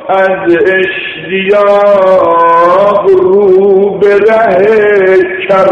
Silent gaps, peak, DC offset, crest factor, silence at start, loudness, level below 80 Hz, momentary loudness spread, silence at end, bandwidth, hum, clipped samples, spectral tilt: none; 0 dBFS; under 0.1%; 6 dB; 0 s; -7 LUFS; -46 dBFS; 4 LU; 0 s; 6.6 kHz; none; 1%; -7 dB/octave